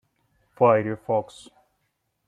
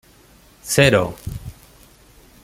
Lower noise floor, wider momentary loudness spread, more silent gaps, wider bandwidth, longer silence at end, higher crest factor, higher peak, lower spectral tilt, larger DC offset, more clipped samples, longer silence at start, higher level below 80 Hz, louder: first, -75 dBFS vs -50 dBFS; second, 9 LU vs 23 LU; neither; second, 10.5 kHz vs 16.5 kHz; first, 1.05 s vs 0.9 s; about the same, 20 dB vs 22 dB; second, -6 dBFS vs -2 dBFS; first, -7.5 dB/octave vs -4.5 dB/octave; neither; neither; about the same, 0.6 s vs 0.65 s; second, -68 dBFS vs -42 dBFS; second, -23 LUFS vs -17 LUFS